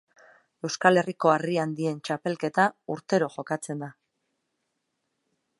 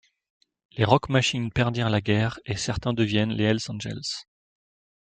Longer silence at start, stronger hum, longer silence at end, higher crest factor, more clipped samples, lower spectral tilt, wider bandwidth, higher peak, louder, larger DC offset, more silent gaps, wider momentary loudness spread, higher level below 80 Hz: about the same, 0.65 s vs 0.75 s; neither; first, 1.7 s vs 0.85 s; about the same, 26 dB vs 24 dB; neither; about the same, -5 dB/octave vs -5.5 dB/octave; first, 11.5 kHz vs 9.2 kHz; about the same, -2 dBFS vs -2 dBFS; about the same, -26 LUFS vs -25 LUFS; neither; neither; first, 14 LU vs 10 LU; second, -78 dBFS vs -50 dBFS